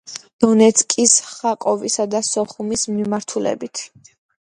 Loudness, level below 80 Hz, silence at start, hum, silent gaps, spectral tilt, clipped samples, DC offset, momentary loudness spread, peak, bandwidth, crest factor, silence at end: -17 LUFS; -58 dBFS; 0.05 s; none; 0.33-0.39 s; -3 dB/octave; under 0.1%; under 0.1%; 14 LU; 0 dBFS; 11 kHz; 18 dB; 0.75 s